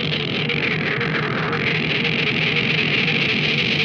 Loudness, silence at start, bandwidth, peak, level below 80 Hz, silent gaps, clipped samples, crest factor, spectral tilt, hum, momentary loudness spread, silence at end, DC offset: -19 LUFS; 0 s; 7.4 kHz; -8 dBFS; -50 dBFS; none; under 0.1%; 14 dB; -5.5 dB/octave; none; 4 LU; 0 s; under 0.1%